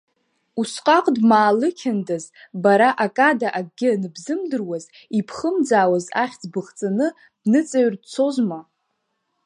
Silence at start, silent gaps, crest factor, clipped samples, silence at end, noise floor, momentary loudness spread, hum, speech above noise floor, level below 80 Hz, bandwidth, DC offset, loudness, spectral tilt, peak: 0.55 s; none; 18 dB; under 0.1%; 0.85 s; -73 dBFS; 12 LU; none; 54 dB; -72 dBFS; 11 kHz; under 0.1%; -20 LUFS; -5.5 dB/octave; -2 dBFS